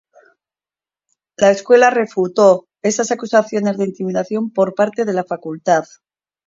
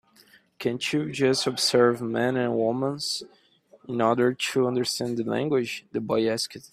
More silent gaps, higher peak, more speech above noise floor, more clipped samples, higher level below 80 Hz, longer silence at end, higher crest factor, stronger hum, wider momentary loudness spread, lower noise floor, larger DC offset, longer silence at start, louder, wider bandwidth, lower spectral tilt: neither; first, 0 dBFS vs -6 dBFS; first, over 75 dB vs 33 dB; neither; about the same, -64 dBFS vs -68 dBFS; first, 0.65 s vs 0.05 s; about the same, 16 dB vs 20 dB; neither; about the same, 10 LU vs 8 LU; first, under -90 dBFS vs -58 dBFS; neither; first, 1.4 s vs 0.6 s; first, -16 LUFS vs -25 LUFS; second, 7.8 kHz vs 15 kHz; about the same, -5 dB/octave vs -4.5 dB/octave